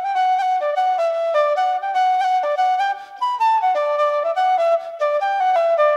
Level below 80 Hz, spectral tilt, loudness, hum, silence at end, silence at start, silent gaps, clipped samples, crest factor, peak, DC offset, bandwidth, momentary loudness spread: -80 dBFS; 1 dB/octave; -19 LUFS; none; 0 s; 0 s; none; under 0.1%; 10 dB; -8 dBFS; under 0.1%; 11.5 kHz; 3 LU